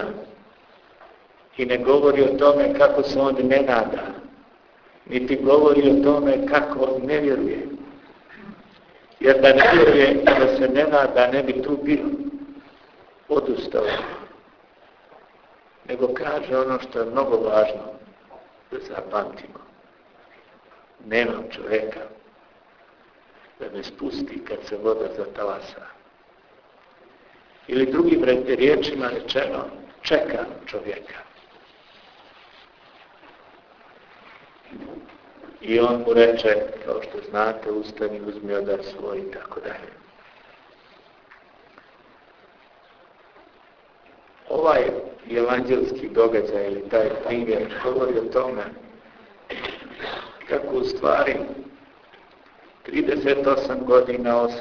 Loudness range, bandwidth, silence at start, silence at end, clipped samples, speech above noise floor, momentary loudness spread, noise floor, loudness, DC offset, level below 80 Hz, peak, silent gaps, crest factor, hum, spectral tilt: 13 LU; 5.4 kHz; 0 s; 0 s; under 0.1%; 34 dB; 18 LU; -55 dBFS; -21 LUFS; under 0.1%; -52 dBFS; 0 dBFS; none; 22 dB; none; -6.5 dB/octave